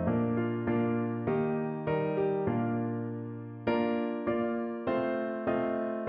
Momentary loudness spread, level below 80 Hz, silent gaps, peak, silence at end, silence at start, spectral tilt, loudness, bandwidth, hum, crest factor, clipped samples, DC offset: 4 LU; -62 dBFS; none; -16 dBFS; 0 s; 0 s; -11 dB/octave; -31 LUFS; 5.2 kHz; none; 14 dB; under 0.1%; under 0.1%